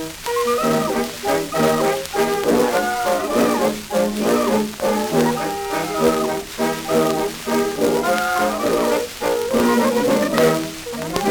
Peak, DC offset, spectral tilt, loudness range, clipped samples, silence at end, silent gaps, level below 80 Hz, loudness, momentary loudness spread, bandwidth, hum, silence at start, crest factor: 0 dBFS; under 0.1%; -4 dB/octave; 1 LU; under 0.1%; 0 s; none; -46 dBFS; -19 LUFS; 5 LU; over 20 kHz; none; 0 s; 18 dB